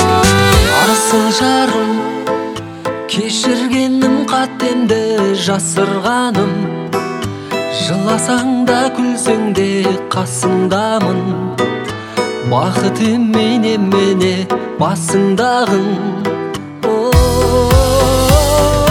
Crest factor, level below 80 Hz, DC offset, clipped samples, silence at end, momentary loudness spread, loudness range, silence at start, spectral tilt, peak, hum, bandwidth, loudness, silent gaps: 14 dB; -26 dBFS; under 0.1%; under 0.1%; 0 s; 8 LU; 3 LU; 0 s; -4.5 dB/octave; 0 dBFS; none; 18 kHz; -14 LUFS; none